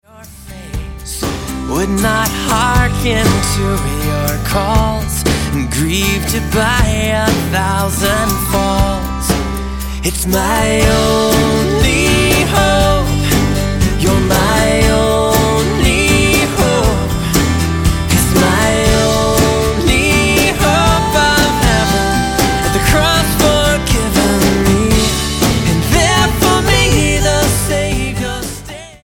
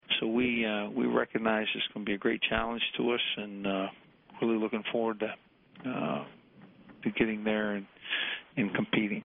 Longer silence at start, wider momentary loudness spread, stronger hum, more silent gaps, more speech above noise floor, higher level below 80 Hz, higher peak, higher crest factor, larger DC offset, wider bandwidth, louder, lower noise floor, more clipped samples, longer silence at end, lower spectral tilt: about the same, 0.15 s vs 0.1 s; second, 6 LU vs 9 LU; neither; neither; second, 21 dB vs 25 dB; first, -20 dBFS vs -60 dBFS; first, 0 dBFS vs -12 dBFS; second, 12 dB vs 20 dB; neither; first, 17.5 kHz vs 3.9 kHz; first, -13 LUFS vs -31 LUFS; second, -34 dBFS vs -56 dBFS; neither; about the same, 0.05 s vs 0.05 s; first, -4.5 dB/octave vs -2.5 dB/octave